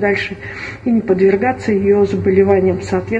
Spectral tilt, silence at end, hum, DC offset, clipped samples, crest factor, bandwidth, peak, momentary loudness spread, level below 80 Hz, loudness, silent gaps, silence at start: -7.5 dB/octave; 0 s; none; under 0.1%; under 0.1%; 14 dB; 8.2 kHz; 0 dBFS; 11 LU; -44 dBFS; -15 LUFS; none; 0 s